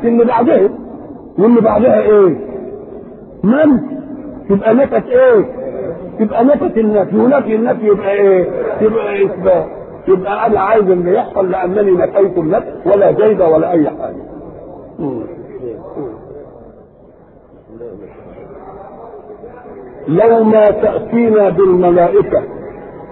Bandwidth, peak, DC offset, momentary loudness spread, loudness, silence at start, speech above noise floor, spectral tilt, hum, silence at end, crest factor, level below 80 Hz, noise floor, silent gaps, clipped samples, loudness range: 4.2 kHz; 0 dBFS; under 0.1%; 23 LU; -12 LUFS; 0 s; 31 dB; -12.5 dB/octave; none; 0 s; 12 dB; -44 dBFS; -42 dBFS; none; under 0.1%; 16 LU